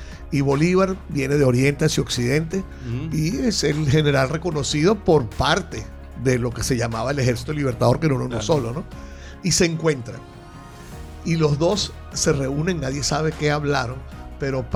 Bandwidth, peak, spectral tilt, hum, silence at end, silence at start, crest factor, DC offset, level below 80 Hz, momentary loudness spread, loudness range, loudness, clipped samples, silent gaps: 15 kHz; -6 dBFS; -5 dB/octave; none; 0 s; 0 s; 16 dB; under 0.1%; -38 dBFS; 17 LU; 3 LU; -21 LUFS; under 0.1%; none